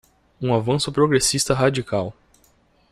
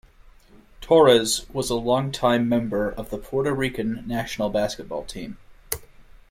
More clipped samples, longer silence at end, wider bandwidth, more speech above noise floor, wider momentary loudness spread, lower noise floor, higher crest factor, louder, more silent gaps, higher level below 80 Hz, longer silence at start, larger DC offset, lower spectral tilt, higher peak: neither; first, 0.8 s vs 0.15 s; about the same, 16 kHz vs 16.5 kHz; first, 39 dB vs 28 dB; second, 9 LU vs 16 LU; first, -59 dBFS vs -51 dBFS; about the same, 18 dB vs 20 dB; first, -20 LUFS vs -23 LUFS; neither; about the same, -48 dBFS vs -46 dBFS; second, 0.4 s vs 0.8 s; neither; about the same, -4.5 dB/octave vs -4.5 dB/octave; about the same, -4 dBFS vs -4 dBFS